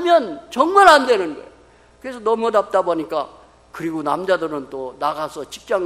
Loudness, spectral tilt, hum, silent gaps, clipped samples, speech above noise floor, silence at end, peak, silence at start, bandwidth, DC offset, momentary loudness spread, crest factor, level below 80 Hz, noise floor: -18 LUFS; -3.5 dB/octave; none; none; under 0.1%; 32 dB; 0 s; 0 dBFS; 0 s; 14 kHz; under 0.1%; 20 LU; 18 dB; -56 dBFS; -50 dBFS